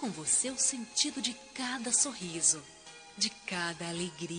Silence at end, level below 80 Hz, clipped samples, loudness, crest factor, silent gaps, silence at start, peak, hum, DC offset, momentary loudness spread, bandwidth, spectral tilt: 0 s; -72 dBFS; under 0.1%; -31 LUFS; 22 dB; none; 0 s; -12 dBFS; none; under 0.1%; 10 LU; 10 kHz; -1 dB/octave